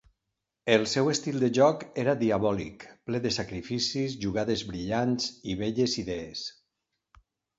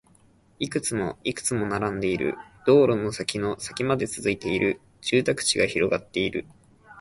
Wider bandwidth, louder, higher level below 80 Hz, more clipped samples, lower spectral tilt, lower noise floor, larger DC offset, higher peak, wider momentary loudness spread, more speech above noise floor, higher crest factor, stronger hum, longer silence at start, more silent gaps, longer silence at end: second, 8 kHz vs 11.5 kHz; second, -28 LUFS vs -25 LUFS; about the same, -56 dBFS vs -54 dBFS; neither; about the same, -5 dB/octave vs -4 dB/octave; first, -84 dBFS vs -58 dBFS; neither; about the same, -8 dBFS vs -6 dBFS; about the same, 11 LU vs 9 LU; first, 56 dB vs 34 dB; about the same, 22 dB vs 18 dB; neither; about the same, 0.65 s vs 0.6 s; neither; first, 1.05 s vs 0 s